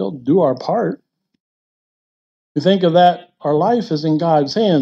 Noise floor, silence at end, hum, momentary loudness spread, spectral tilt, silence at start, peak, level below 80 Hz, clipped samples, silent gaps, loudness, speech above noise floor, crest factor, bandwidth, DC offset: under -90 dBFS; 0 s; none; 10 LU; -7.5 dB/octave; 0 s; -2 dBFS; -68 dBFS; under 0.1%; 1.40-2.55 s; -16 LUFS; over 75 dB; 16 dB; 7.8 kHz; under 0.1%